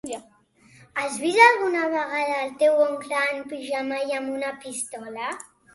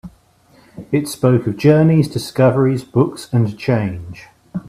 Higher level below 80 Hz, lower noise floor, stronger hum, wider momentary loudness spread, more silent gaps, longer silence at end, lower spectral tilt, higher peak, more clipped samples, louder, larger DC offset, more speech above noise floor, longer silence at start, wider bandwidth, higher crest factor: second, -72 dBFS vs -50 dBFS; first, -55 dBFS vs -51 dBFS; neither; first, 17 LU vs 11 LU; neither; first, 0.35 s vs 0.1 s; second, -2 dB/octave vs -7.5 dB/octave; about the same, -2 dBFS vs 0 dBFS; neither; second, -23 LUFS vs -16 LUFS; neither; second, 32 dB vs 36 dB; about the same, 0.05 s vs 0.05 s; second, 12 kHz vs 14.5 kHz; first, 22 dB vs 16 dB